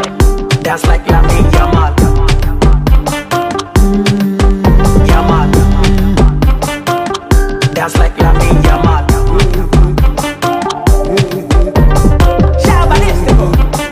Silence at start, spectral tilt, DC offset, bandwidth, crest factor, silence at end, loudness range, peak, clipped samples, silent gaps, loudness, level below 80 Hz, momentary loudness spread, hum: 0 s; -6 dB/octave; under 0.1%; 15.5 kHz; 8 dB; 0 s; 1 LU; 0 dBFS; under 0.1%; none; -11 LUFS; -10 dBFS; 5 LU; none